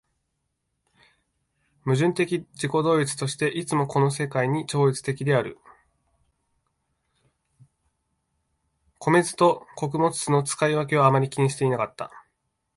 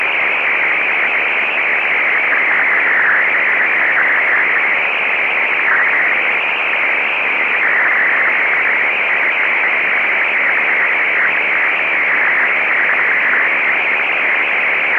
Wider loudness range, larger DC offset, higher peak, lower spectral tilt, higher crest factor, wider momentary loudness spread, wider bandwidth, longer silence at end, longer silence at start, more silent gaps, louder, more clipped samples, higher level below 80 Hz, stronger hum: first, 7 LU vs 1 LU; neither; about the same, -6 dBFS vs -4 dBFS; first, -5.5 dB/octave vs -3.5 dB/octave; first, 20 dB vs 10 dB; first, 9 LU vs 2 LU; first, 11.5 kHz vs 8 kHz; first, 0.55 s vs 0 s; first, 1.85 s vs 0 s; neither; second, -24 LUFS vs -12 LUFS; neither; about the same, -64 dBFS vs -68 dBFS; neither